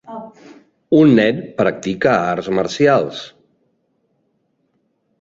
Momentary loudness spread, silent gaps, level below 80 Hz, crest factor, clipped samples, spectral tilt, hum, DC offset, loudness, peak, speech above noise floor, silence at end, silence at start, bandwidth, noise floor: 21 LU; none; -56 dBFS; 16 dB; under 0.1%; -6.5 dB/octave; none; under 0.1%; -16 LUFS; -2 dBFS; 51 dB; 1.95 s; 0.1 s; 7.8 kHz; -66 dBFS